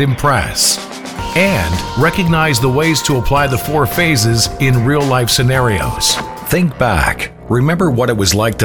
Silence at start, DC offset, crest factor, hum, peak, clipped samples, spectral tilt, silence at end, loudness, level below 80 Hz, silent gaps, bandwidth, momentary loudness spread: 0 s; 0.7%; 12 dB; none; -2 dBFS; under 0.1%; -4 dB/octave; 0 s; -13 LUFS; -30 dBFS; none; over 20 kHz; 5 LU